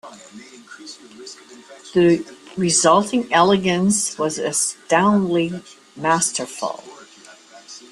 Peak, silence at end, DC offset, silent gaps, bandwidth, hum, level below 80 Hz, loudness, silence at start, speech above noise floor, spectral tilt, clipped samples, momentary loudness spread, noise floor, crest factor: -2 dBFS; 0.1 s; under 0.1%; none; 12.5 kHz; none; -60 dBFS; -18 LUFS; 0.05 s; 26 dB; -4 dB/octave; under 0.1%; 22 LU; -46 dBFS; 20 dB